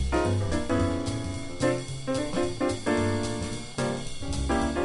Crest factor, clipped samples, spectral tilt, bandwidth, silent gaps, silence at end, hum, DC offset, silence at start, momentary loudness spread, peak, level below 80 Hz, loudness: 16 dB; under 0.1%; -5.5 dB/octave; 11.5 kHz; none; 0 s; none; under 0.1%; 0 s; 7 LU; -12 dBFS; -38 dBFS; -29 LUFS